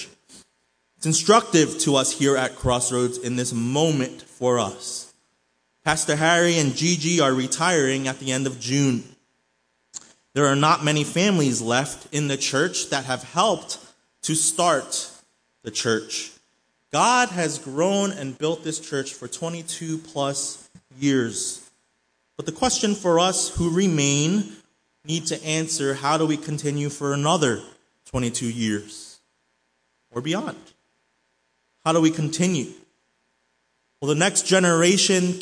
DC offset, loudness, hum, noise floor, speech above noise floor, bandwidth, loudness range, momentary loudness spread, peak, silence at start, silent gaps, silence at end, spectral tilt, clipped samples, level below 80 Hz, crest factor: under 0.1%; -22 LUFS; none; -70 dBFS; 48 dB; 10.5 kHz; 6 LU; 13 LU; -2 dBFS; 0 s; none; 0 s; -3.5 dB/octave; under 0.1%; -54 dBFS; 20 dB